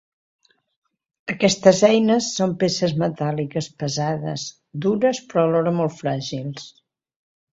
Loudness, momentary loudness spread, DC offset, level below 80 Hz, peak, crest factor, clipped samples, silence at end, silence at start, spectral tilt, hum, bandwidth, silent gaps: -21 LUFS; 15 LU; under 0.1%; -60 dBFS; 0 dBFS; 22 dB; under 0.1%; 0.85 s; 1.25 s; -5 dB/octave; none; 8 kHz; none